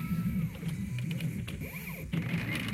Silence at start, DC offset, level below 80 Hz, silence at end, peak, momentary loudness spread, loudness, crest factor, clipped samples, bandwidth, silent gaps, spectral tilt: 0 s; under 0.1%; -50 dBFS; 0 s; -20 dBFS; 6 LU; -35 LUFS; 14 dB; under 0.1%; 16 kHz; none; -6 dB/octave